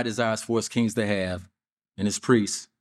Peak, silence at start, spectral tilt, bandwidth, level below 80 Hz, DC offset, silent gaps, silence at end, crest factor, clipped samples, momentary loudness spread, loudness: -6 dBFS; 0 s; -4.5 dB/octave; 14 kHz; -62 dBFS; under 0.1%; 1.72-1.77 s; 0.15 s; 20 dB; under 0.1%; 8 LU; -26 LUFS